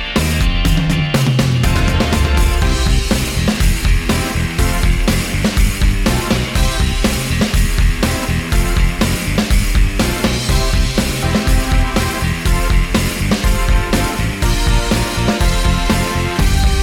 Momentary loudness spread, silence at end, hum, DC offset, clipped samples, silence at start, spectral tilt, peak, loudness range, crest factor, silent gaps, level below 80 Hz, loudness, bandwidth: 2 LU; 0 s; none; under 0.1%; under 0.1%; 0 s; -4.5 dB/octave; 0 dBFS; 1 LU; 12 dB; none; -16 dBFS; -16 LUFS; 17 kHz